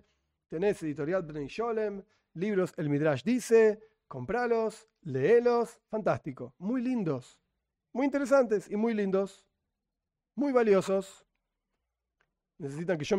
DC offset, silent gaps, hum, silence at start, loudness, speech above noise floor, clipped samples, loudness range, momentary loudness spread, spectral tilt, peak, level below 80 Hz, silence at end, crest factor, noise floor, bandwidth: under 0.1%; none; none; 0.5 s; -29 LUFS; 59 dB; under 0.1%; 4 LU; 17 LU; -6.5 dB/octave; -14 dBFS; -68 dBFS; 0 s; 18 dB; -88 dBFS; 13 kHz